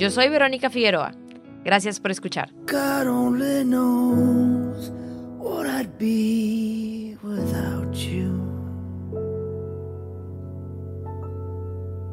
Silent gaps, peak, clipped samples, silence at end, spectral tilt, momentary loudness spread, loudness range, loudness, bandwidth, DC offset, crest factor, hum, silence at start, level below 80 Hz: none; -4 dBFS; under 0.1%; 0 s; -5.5 dB/octave; 16 LU; 9 LU; -24 LUFS; 16 kHz; under 0.1%; 20 dB; none; 0 s; -54 dBFS